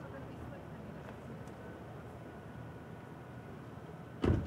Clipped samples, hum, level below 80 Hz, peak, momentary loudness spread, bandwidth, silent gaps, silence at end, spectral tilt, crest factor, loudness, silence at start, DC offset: under 0.1%; none; -54 dBFS; -18 dBFS; 3 LU; 15.5 kHz; none; 0 s; -8 dB/octave; 24 dB; -46 LUFS; 0 s; under 0.1%